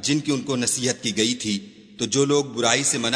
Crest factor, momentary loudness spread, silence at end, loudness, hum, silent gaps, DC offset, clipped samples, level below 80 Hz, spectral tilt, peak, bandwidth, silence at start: 22 dB; 7 LU; 0 s; -22 LUFS; none; none; under 0.1%; under 0.1%; -62 dBFS; -3 dB/octave; -2 dBFS; 11 kHz; 0 s